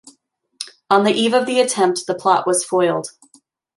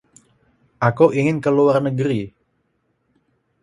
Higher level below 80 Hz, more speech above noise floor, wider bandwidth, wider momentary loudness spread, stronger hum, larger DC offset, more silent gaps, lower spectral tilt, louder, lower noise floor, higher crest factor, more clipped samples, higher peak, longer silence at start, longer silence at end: second, -72 dBFS vs -58 dBFS; second, 44 dB vs 51 dB; about the same, 12 kHz vs 11.5 kHz; first, 17 LU vs 8 LU; neither; neither; neither; second, -3.5 dB/octave vs -8 dB/octave; about the same, -17 LUFS vs -18 LUFS; second, -60 dBFS vs -68 dBFS; about the same, 16 dB vs 20 dB; neither; about the same, -2 dBFS vs 0 dBFS; second, 0.6 s vs 0.8 s; second, 0.7 s vs 1.35 s